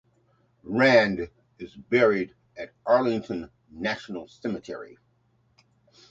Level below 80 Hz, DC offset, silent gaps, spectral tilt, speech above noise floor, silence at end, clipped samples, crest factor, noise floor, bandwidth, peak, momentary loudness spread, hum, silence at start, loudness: -60 dBFS; under 0.1%; none; -6 dB/octave; 42 dB; 1.25 s; under 0.1%; 22 dB; -67 dBFS; 7.8 kHz; -4 dBFS; 23 LU; none; 0.65 s; -25 LUFS